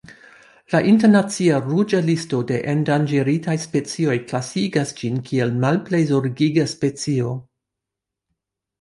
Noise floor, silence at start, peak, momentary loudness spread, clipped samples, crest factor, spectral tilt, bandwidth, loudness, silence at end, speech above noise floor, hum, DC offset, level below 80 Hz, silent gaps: -84 dBFS; 0.1 s; -4 dBFS; 7 LU; under 0.1%; 16 dB; -6.5 dB/octave; 11.5 kHz; -20 LUFS; 1.4 s; 65 dB; none; under 0.1%; -60 dBFS; none